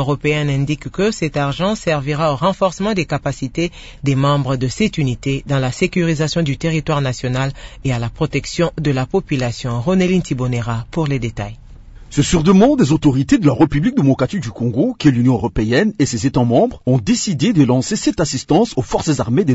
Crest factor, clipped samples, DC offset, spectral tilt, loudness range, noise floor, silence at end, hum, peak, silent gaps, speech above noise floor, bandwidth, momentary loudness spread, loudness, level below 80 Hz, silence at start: 14 dB; under 0.1%; under 0.1%; -6 dB/octave; 4 LU; -37 dBFS; 0 s; none; -2 dBFS; none; 21 dB; 8 kHz; 7 LU; -17 LUFS; -36 dBFS; 0 s